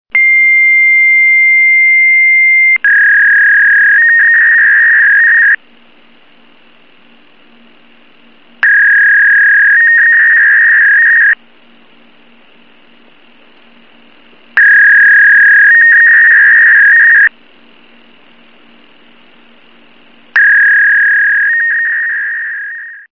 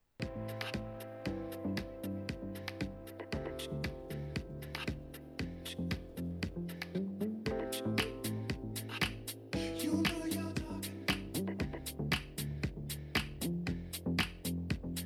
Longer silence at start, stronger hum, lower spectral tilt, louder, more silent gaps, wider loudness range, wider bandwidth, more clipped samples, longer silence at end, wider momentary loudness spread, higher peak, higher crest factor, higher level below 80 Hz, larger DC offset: about the same, 0.15 s vs 0.2 s; neither; second, -1.5 dB/octave vs -5 dB/octave; first, -4 LUFS vs -39 LUFS; neither; first, 10 LU vs 5 LU; second, 5.4 kHz vs 19 kHz; neither; first, 0.2 s vs 0 s; about the same, 8 LU vs 8 LU; first, 0 dBFS vs -18 dBFS; second, 8 dB vs 22 dB; second, -72 dBFS vs -52 dBFS; first, 0.7% vs under 0.1%